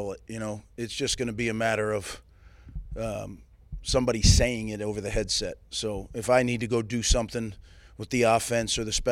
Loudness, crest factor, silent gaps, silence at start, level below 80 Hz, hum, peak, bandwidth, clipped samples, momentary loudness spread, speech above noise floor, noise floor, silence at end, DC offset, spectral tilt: -27 LUFS; 22 dB; none; 0 s; -36 dBFS; none; -6 dBFS; 16 kHz; under 0.1%; 15 LU; 23 dB; -50 dBFS; 0 s; under 0.1%; -4 dB/octave